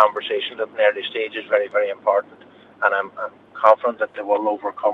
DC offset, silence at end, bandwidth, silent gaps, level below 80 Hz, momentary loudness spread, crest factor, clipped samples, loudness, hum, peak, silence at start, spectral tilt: under 0.1%; 0 s; 4.7 kHz; none; -76 dBFS; 10 LU; 20 dB; under 0.1%; -21 LUFS; none; 0 dBFS; 0 s; -4.5 dB/octave